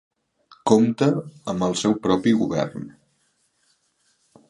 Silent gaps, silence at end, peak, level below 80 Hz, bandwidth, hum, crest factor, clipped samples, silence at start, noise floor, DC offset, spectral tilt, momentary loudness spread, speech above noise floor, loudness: none; 1.6 s; -2 dBFS; -58 dBFS; 11 kHz; none; 22 dB; under 0.1%; 0.65 s; -67 dBFS; under 0.1%; -6 dB/octave; 12 LU; 47 dB; -22 LUFS